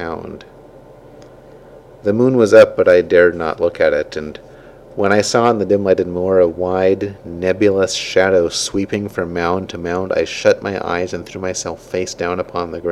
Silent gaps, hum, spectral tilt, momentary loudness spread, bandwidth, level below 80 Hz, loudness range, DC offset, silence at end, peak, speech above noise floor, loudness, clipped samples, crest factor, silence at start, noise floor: none; none; -4.5 dB/octave; 14 LU; 12.5 kHz; -48 dBFS; 6 LU; under 0.1%; 0 s; 0 dBFS; 25 dB; -16 LUFS; 0.1%; 16 dB; 0 s; -41 dBFS